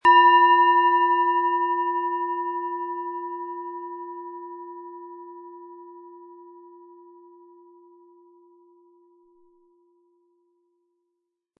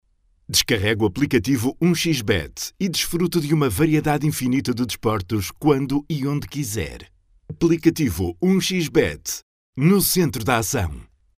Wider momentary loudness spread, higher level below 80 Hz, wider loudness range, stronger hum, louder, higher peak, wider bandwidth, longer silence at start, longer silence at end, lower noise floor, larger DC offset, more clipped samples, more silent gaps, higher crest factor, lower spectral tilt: first, 27 LU vs 8 LU; second, -76 dBFS vs -42 dBFS; first, 26 LU vs 3 LU; neither; about the same, -21 LUFS vs -21 LUFS; about the same, -6 dBFS vs -4 dBFS; second, 5.6 kHz vs 16 kHz; second, 0.05 s vs 0.5 s; first, 5.15 s vs 0.35 s; first, -80 dBFS vs -41 dBFS; neither; neither; second, none vs 9.43-9.73 s; about the same, 20 dB vs 18 dB; about the same, -4 dB/octave vs -5 dB/octave